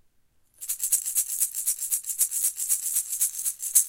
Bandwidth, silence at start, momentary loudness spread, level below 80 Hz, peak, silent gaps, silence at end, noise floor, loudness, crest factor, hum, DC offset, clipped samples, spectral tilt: 17 kHz; 0.6 s; 5 LU; -70 dBFS; -4 dBFS; none; 0 s; -64 dBFS; -24 LUFS; 24 dB; none; under 0.1%; under 0.1%; 5 dB/octave